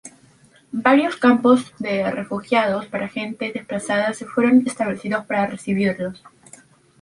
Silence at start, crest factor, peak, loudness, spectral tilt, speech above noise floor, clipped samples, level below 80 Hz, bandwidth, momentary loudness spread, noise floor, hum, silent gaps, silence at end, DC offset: 0.05 s; 18 dB; -2 dBFS; -20 LUFS; -5.5 dB/octave; 33 dB; under 0.1%; -62 dBFS; 11.5 kHz; 11 LU; -53 dBFS; none; none; 0.75 s; under 0.1%